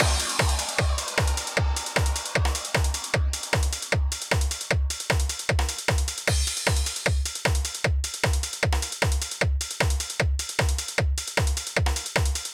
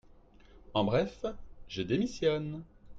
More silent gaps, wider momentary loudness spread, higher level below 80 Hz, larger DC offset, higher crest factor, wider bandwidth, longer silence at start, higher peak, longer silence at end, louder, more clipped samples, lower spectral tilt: neither; second, 2 LU vs 13 LU; first, -28 dBFS vs -54 dBFS; neither; about the same, 18 dB vs 18 dB; first, 17 kHz vs 7.8 kHz; second, 0 s vs 0.55 s; first, -8 dBFS vs -16 dBFS; about the same, 0 s vs 0 s; first, -25 LUFS vs -33 LUFS; neither; second, -3 dB/octave vs -6.5 dB/octave